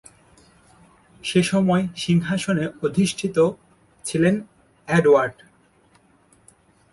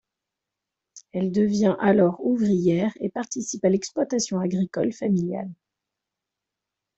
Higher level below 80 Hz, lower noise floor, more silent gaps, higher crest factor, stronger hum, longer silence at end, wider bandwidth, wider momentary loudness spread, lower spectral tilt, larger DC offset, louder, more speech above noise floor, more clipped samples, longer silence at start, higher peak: first, -56 dBFS vs -64 dBFS; second, -58 dBFS vs -86 dBFS; neither; about the same, 18 dB vs 18 dB; neither; first, 1.6 s vs 1.45 s; first, 11.5 kHz vs 8.2 kHz; about the same, 10 LU vs 10 LU; about the same, -6 dB/octave vs -6 dB/octave; neither; about the same, -21 LUFS vs -23 LUFS; second, 38 dB vs 63 dB; neither; first, 1.25 s vs 0.95 s; about the same, -4 dBFS vs -6 dBFS